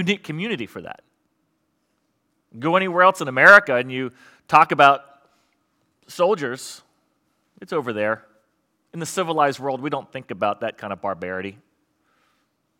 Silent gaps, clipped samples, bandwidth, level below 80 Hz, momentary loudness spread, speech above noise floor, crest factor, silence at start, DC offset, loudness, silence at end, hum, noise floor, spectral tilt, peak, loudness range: none; under 0.1%; 16.5 kHz; -70 dBFS; 20 LU; 51 dB; 22 dB; 0 s; under 0.1%; -19 LUFS; 1.3 s; none; -71 dBFS; -4.5 dB/octave; 0 dBFS; 11 LU